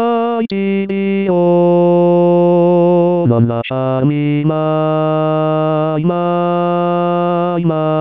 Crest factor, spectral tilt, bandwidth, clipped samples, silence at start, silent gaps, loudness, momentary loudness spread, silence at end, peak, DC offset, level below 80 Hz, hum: 12 dB; -11 dB/octave; 4.8 kHz; under 0.1%; 0 s; none; -13 LUFS; 6 LU; 0 s; 0 dBFS; 0.4%; -58 dBFS; none